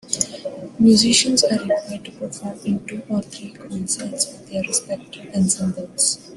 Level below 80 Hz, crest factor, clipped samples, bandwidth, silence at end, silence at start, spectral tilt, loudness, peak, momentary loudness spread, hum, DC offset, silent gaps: -58 dBFS; 20 dB; under 0.1%; 12.5 kHz; 0 s; 0.05 s; -3.5 dB/octave; -20 LUFS; -2 dBFS; 17 LU; none; under 0.1%; none